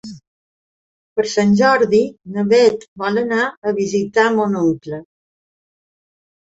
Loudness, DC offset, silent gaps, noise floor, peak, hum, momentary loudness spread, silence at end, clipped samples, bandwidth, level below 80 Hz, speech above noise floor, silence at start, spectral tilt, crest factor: -17 LUFS; under 0.1%; 0.27-1.16 s, 2.88-2.96 s, 3.57-3.62 s; under -90 dBFS; -2 dBFS; none; 12 LU; 1.5 s; under 0.1%; 8 kHz; -58 dBFS; over 74 dB; 0.05 s; -5.5 dB/octave; 16 dB